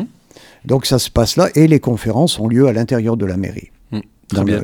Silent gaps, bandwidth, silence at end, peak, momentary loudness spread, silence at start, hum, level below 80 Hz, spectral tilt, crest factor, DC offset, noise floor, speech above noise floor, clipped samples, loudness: none; 18 kHz; 0 s; 0 dBFS; 16 LU; 0 s; none; -36 dBFS; -6 dB/octave; 16 dB; under 0.1%; -45 dBFS; 30 dB; under 0.1%; -15 LUFS